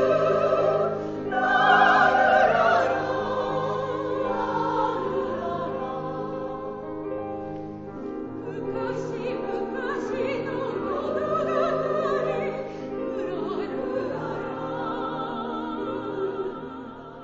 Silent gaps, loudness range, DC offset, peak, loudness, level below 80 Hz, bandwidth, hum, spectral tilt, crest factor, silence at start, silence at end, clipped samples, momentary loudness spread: none; 11 LU; under 0.1%; -6 dBFS; -26 LUFS; -56 dBFS; 7.8 kHz; none; -6 dB/octave; 20 dB; 0 s; 0 s; under 0.1%; 15 LU